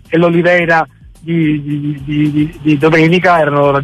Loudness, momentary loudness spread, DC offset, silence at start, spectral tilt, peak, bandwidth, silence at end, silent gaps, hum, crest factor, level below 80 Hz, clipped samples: -12 LUFS; 10 LU; under 0.1%; 0.1 s; -7.5 dB/octave; -2 dBFS; 11 kHz; 0 s; none; none; 10 dB; -42 dBFS; under 0.1%